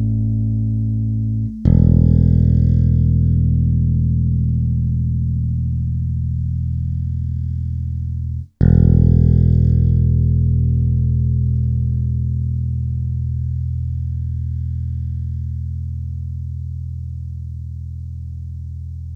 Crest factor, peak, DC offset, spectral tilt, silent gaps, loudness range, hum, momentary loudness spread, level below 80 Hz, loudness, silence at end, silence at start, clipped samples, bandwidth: 16 dB; 0 dBFS; under 0.1%; -12.5 dB/octave; none; 11 LU; none; 15 LU; -24 dBFS; -18 LUFS; 0 s; 0 s; under 0.1%; 1.9 kHz